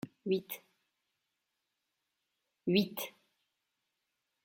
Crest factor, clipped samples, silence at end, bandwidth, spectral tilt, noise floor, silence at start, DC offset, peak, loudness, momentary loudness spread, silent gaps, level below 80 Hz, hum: 24 dB; under 0.1%; 1.35 s; 16.5 kHz; -5.5 dB/octave; -86 dBFS; 0.05 s; under 0.1%; -16 dBFS; -35 LUFS; 14 LU; none; -80 dBFS; none